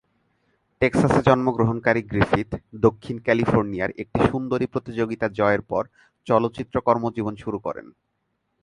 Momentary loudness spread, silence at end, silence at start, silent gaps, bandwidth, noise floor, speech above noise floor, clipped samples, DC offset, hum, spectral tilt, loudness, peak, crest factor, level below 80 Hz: 10 LU; 0.75 s; 0.8 s; none; 11.5 kHz; -74 dBFS; 52 dB; under 0.1%; under 0.1%; none; -7.5 dB/octave; -23 LUFS; -2 dBFS; 20 dB; -46 dBFS